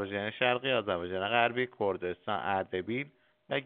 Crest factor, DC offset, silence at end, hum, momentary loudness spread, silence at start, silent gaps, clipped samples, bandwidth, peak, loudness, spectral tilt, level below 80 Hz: 22 dB; under 0.1%; 0 s; none; 8 LU; 0 s; none; under 0.1%; 4.5 kHz; -12 dBFS; -31 LUFS; -2.5 dB/octave; -72 dBFS